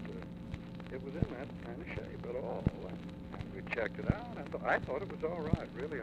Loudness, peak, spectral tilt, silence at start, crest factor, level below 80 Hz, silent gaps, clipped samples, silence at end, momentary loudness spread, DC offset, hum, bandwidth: -39 LUFS; -14 dBFS; -8 dB/octave; 0 s; 24 dB; -52 dBFS; none; under 0.1%; 0 s; 11 LU; under 0.1%; none; 9.6 kHz